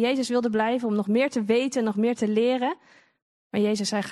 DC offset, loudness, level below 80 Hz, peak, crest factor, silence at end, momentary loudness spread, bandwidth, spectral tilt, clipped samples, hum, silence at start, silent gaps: under 0.1%; -24 LUFS; -74 dBFS; -8 dBFS; 16 dB; 0 s; 4 LU; 12 kHz; -5 dB/octave; under 0.1%; none; 0 s; 3.22-3.50 s